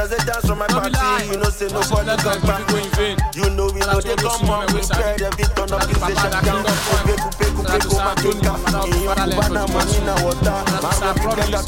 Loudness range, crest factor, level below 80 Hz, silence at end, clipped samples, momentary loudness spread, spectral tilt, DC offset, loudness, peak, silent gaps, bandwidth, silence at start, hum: 1 LU; 16 dB; -24 dBFS; 0 s; under 0.1%; 3 LU; -4.5 dB/octave; under 0.1%; -19 LUFS; -2 dBFS; none; 17 kHz; 0 s; none